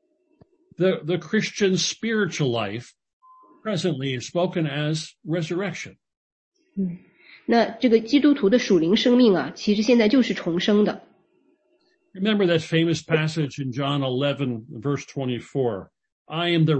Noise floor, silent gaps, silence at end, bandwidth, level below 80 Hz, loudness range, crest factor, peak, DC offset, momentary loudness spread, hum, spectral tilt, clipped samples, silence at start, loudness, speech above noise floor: -66 dBFS; 3.13-3.20 s, 6.17-6.52 s, 16.12-16.25 s; 0 s; 8.6 kHz; -64 dBFS; 8 LU; 18 dB; -6 dBFS; under 0.1%; 12 LU; none; -5.5 dB/octave; under 0.1%; 0.8 s; -22 LUFS; 44 dB